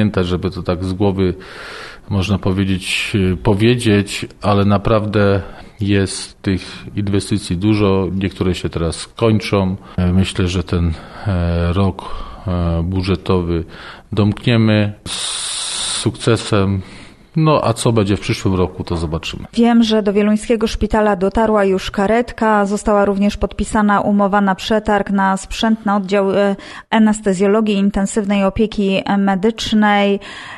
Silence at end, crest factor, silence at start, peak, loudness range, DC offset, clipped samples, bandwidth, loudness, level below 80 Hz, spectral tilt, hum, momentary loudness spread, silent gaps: 0 s; 14 dB; 0 s; -2 dBFS; 3 LU; under 0.1%; under 0.1%; 12.5 kHz; -16 LUFS; -34 dBFS; -6 dB/octave; none; 8 LU; none